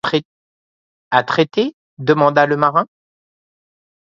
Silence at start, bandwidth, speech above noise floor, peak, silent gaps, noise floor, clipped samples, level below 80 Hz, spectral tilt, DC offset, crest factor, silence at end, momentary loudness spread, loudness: 0.05 s; 7.4 kHz; over 75 dB; 0 dBFS; 0.25-1.11 s, 1.73-1.97 s; under -90 dBFS; under 0.1%; -64 dBFS; -6.5 dB/octave; under 0.1%; 18 dB; 1.2 s; 10 LU; -16 LUFS